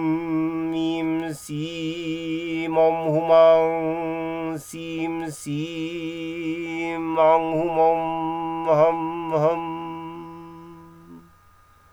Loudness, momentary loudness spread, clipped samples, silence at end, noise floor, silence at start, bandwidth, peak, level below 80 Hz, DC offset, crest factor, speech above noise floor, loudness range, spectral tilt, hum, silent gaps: -23 LUFS; 13 LU; under 0.1%; 0.7 s; -54 dBFS; 0 s; 15.5 kHz; -6 dBFS; -60 dBFS; under 0.1%; 18 dB; 33 dB; 5 LU; -6.5 dB/octave; none; none